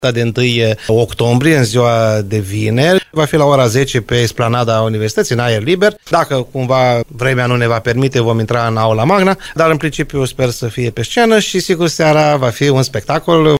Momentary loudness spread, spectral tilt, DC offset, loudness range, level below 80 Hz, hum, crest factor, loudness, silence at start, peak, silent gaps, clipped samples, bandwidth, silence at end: 6 LU; -5.5 dB/octave; under 0.1%; 2 LU; -40 dBFS; none; 12 dB; -13 LUFS; 0 s; 0 dBFS; none; under 0.1%; 16 kHz; 0 s